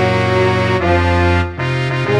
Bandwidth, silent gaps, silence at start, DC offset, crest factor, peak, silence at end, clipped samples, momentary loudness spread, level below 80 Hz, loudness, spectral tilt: 10 kHz; none; 0 s; under 0.1%; 12 dB; -2 dBFS; 0 s; under 0.1%; 4 LU; -30 dBFS; -15 LUFS; -7 dB/octave